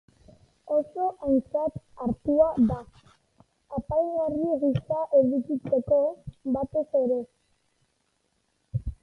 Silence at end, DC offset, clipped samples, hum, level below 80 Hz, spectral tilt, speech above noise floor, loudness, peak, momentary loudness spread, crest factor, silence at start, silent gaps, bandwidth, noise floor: 0.1 s; under 0.1%; under 0.1%; none; -50 dBFS; -10.5 dB/octave; 47 dB; -27 LUFS; -10 dBFS; 12 LU; 18 dB; 0.65 s; none; 5.8 kHz; -73 dBFS